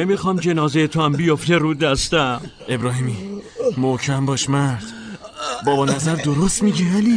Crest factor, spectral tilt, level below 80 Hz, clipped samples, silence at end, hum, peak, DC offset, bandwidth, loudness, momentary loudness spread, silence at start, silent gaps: 14 dB; -5 dB/octave; -42 dBFS; under 0.1%; 0 s; none; -4 dBFS; under 0.1%; 10 kHz; -19 LUFS; 11 LU; 0 s; none